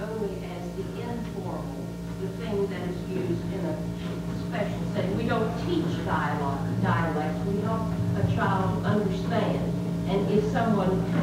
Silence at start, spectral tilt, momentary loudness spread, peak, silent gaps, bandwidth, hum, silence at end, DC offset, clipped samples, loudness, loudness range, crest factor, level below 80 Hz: 0 s; -7.5 dB/octave; 9 LU; -12 dBFS; none; 15 kHz; none; 0 s; under 0.1%; under 0.1%; -28 LUFS; 6 LU; 16 dB; -44 dBFS